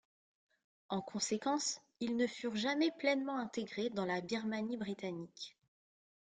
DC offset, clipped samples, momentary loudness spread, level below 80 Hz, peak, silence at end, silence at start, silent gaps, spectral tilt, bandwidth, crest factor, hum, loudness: under 0.1%; under 0.1%; 9 LU; -80 dBFS; -18 dBFS; 0.85 s; 0.9 s; none; -3.5 dB/octave; 9.6 kHz; 20 dB; none; -38 LUFS